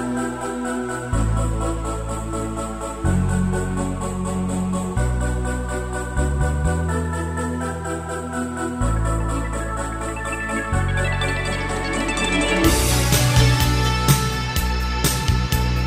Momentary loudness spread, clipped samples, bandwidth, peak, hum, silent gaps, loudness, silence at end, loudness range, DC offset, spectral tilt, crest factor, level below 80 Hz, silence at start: 9 LU; under 0.1%; 16 kHz; -2 dBFS; none; none; -22 LUFS; 0 s; 6 LU; under 0.1%; -4.5 dB/octave; 18 dB; -26 dBFS; 0 s